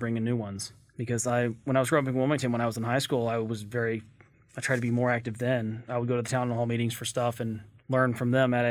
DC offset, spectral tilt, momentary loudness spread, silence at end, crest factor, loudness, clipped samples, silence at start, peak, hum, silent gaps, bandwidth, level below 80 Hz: under 0.1%; -5.5 dB/octave; 10 LU; 0 s; 18 dB; -29 LUFS; under 0.1%; 0 s; -10 dBFS; none; none; 15.5 kHz; -64 dBFS